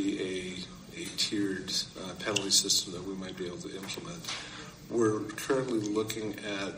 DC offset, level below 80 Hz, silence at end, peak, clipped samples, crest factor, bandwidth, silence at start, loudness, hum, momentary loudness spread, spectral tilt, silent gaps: under 0.1%; -62 dBFS; 0 s; -10 dBFS; under 0.1%; 24 dB; 16 kHz; 0 s; -32 LUFS; none; 14 LU; -2.5 dB/octave; none